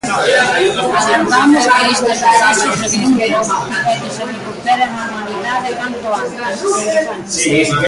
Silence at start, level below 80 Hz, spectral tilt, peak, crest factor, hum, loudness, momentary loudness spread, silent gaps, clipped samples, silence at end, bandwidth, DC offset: 0.05 s; -50 dBFS; -3 dB/octave; 0 dBFS; 14 dB; none; -13 LUFS; 11 LU; none; under 0.1%; 0 s; 11.5 kHz; under 0.1%